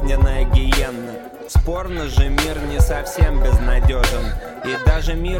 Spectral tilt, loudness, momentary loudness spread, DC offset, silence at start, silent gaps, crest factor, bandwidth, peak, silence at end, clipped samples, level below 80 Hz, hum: -5.5 dB/octave; -19 LUFS; 9 LU; under 0.1%; 0 s; none; 14 dB; 17 kHz; -2 dBFS; 0 s; under 0.1%; -18 dBFS; none